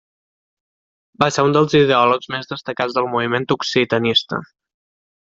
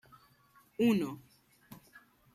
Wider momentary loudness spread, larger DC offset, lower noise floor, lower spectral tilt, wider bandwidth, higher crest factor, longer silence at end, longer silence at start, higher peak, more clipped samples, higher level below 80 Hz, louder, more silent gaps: second, 12 LU vs 26 LU; neither; first, under -90 dBFS vs -66 dBFS; second, -5 dB/octave vs -6.5 dB/octave; second, 7.8 kHz vs 15 kHz; about the same, 20 dB vs 20 dB; first, 0.95 s vs 0.35 s; first, 1.2 s vs 0.8 s; first, 0 dBFS vs -18 dBFS; neither; first, -58 dBFS vs -74 dBFS; first, -17 LUFS vs -32 LUFS; neither